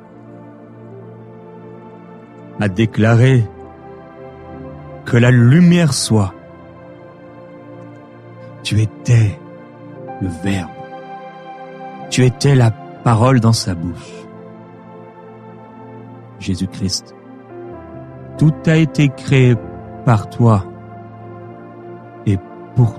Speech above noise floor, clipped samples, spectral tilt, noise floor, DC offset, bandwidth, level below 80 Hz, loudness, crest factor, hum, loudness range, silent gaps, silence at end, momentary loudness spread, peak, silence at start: 25 dB; under 0.1%; -6.5 dB/octave; -37 dBFS; under 0.1%; 12.5 kHz; -46 dBFS; -15 LUFS; 16 dB; none; 10 LU; none; 0 s; 25 LU; -2 dBFS; 0.3 s